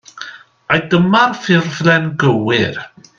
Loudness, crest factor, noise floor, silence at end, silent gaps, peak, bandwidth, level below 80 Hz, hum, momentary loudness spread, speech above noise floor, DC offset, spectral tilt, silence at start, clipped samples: -14 LUFS; 16 dB; -34 dBFS; 0.3 s; none; 0 dBFS; 7.4 kHz; -54 dBFS; none; 17 LU; 20 dB; under 0.1%; -6 dB/octave; 0.15 s; under 0.1%